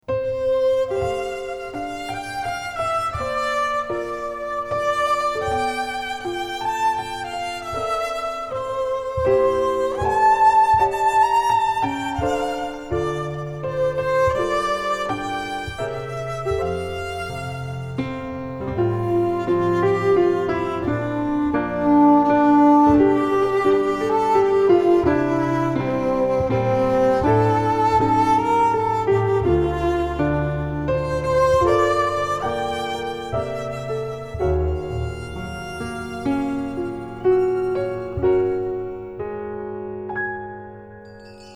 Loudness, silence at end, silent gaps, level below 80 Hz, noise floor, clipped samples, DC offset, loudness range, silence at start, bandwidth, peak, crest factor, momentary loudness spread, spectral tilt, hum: -21 LUFS; 0 s; none; -40 dBFS; -41 dBFS; under 0.1%; under 0.1%; 9 LU; 0.1 s; 14 kHz; -4 dBFS; 16 dB; 12 LU; -6.5 dB/octave; none